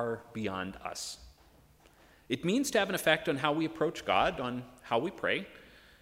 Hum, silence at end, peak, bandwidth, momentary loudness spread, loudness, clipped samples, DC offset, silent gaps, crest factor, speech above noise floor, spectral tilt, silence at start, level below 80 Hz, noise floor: none; 0.3 s; -10 dBFS; 16 kHz; 11 LU; -32 LUFS; under 0.1%; under 0.1%; none; 24 dB; 29 dB; -4 dB/octave; 0 s; -60 dBFS; -61 dBFS